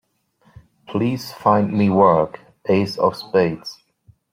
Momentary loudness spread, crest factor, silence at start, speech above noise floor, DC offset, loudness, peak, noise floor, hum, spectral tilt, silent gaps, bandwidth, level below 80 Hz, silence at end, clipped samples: 13 LU; 18 dB; 0.9 s; 41 dB; under 0.1%; -19 LUFS; -2 dBFS; -59 dBFS; none; -7.5 dB/octave; none; 16 kHz; -58 dBFS; 0.6 s; under 0.1%